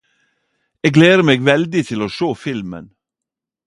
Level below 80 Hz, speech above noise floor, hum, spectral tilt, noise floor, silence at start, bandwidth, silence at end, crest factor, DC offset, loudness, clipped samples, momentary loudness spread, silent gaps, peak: -54 dBFS; 70 dB; none; -6 dB/octave; -85 dBFS; 0.85 s; 11.5 kHz; 0.8 s; 16 dB; under 0.1%; -15 LUFS; under 0.1%; 16 LU; none; 0 dBFS